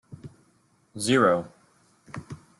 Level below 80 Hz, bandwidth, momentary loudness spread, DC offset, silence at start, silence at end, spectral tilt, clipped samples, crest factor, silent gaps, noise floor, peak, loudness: -66 dBFS; 12 kHz; 25 LU; under 0.1%; 0.1 s; 0.25 s; -4.5 dB/octave; under 0.1%; 22 dB; none; -65 dBFS; -6 dBFS; -23 LUFS